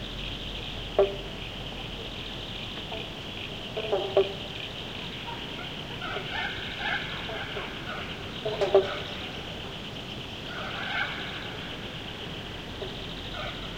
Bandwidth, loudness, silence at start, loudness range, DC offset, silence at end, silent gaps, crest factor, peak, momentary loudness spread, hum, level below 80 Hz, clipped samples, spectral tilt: 16.5 kHz; -32 LUFS; 0 s; 4 LU; 0.1%; 0 s; none; 24 dB; -8 dBFS; 10 LU; none; -48 dBFS; under 0.1%; -4.5 dB/octave